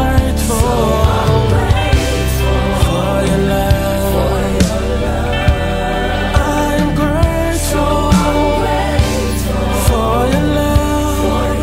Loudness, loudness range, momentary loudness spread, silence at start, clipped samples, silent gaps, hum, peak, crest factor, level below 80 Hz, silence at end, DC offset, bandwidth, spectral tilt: -14 LUFS; 1 LU; 4 LU; 0 s; under 0.1%; none; none; 0 dBFS; 12 dB; -18 dBFS; 0 s; under 0.1%; 16.5 kHz; -5.5 dB/octave